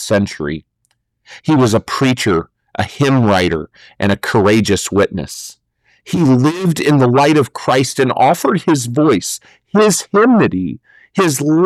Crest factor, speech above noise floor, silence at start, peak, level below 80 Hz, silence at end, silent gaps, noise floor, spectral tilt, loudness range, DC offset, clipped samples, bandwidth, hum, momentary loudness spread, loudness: 10 dB; 52 dB; 0 s; -4 dBFS; -46 dBFS; 0 s; none; -65 dBFS; -5.5 dB/octave; 3 LU; under 0.1%; under 0.1%; 14.5 kHz; none; 13 LU; -14 LUFS